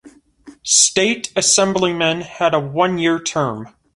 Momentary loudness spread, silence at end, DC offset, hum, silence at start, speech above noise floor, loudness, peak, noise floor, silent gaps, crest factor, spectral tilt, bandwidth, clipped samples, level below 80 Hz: 9 LU; 0.25 s; under 0.1%; none; 0.05 s; 28 dB; -16 LUFS; 0 dBFS; -45 dBFS; none; 18 dB; -2.5 dB/octave; 11.5 kHz; under 0.1%; -56 dBFS